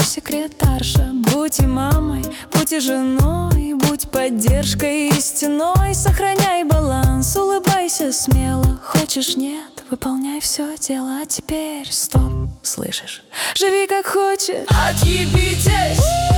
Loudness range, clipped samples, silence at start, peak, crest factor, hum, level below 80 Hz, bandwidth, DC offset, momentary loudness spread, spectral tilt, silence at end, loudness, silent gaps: 4 LU; under 0.1%; 0 s; -4 dBFS; 14 dB; none; -24 dBFS; 19 kHz; under 0.1%; 7 LU; -4.5 dB/octave; 0 s; -18 LUFS; none